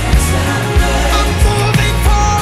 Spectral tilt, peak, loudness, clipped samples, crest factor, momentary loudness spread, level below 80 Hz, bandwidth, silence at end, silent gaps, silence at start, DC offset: -4.5 dB/octave; -2 dBFS; -13 LUFS; under 0.1%; 10 dB; 2 LU; -14 dBFS; 15.5 kHz; 0 s; none; 0 s; under 0.1%